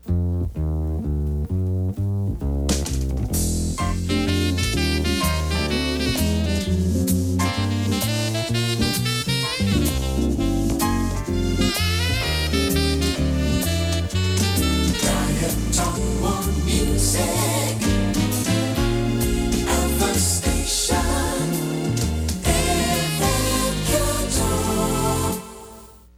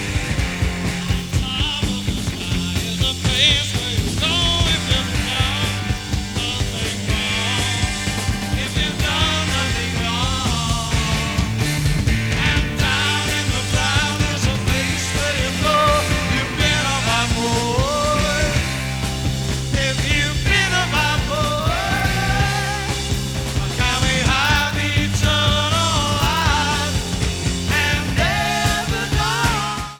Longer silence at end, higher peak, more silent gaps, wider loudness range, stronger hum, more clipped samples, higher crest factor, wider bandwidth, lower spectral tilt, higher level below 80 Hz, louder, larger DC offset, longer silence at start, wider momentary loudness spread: first, 0.2 s vs 0 s; second, -6 dBFS vs -2 dBFS; neither; about the same, 2 LU vs 2 LU; neither; neither; about the same, 16 dB vs 18 dB; second, 16.5 kHz vs 19.5 kHz; about the same, -4.5 dB/octave vs -3.5 dB/octave; about the same, -28 dBFS vs -28 dBFS; second, -22 LUFS vs -19 LUFS; neither; about the same, 0.05 s vs 0 s; about the same, 5 LU vs 6 LU